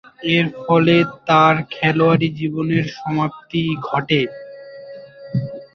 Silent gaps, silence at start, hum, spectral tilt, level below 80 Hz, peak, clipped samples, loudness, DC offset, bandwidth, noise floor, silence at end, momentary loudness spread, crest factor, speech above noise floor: none; 0.2 s; none; -7.5 dB/octave; -56 dBFS; -2 dBFS; under 0.1%; -18 LUFS; under 0.1%; 6.4 kHz; -37 dBFS; 0.1 s; 22 LU; 16 dB; 20 dB